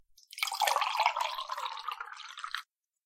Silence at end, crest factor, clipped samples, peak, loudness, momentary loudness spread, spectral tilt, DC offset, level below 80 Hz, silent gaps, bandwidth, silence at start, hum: 0.4 s; 26 dB; under 0.1%; -10 dBFS; -33 LUFS; 13 LU; 4.5 dB/octave; under 0.1%; -82 dBFS; none; 16.5 kHz; 0.3 s; none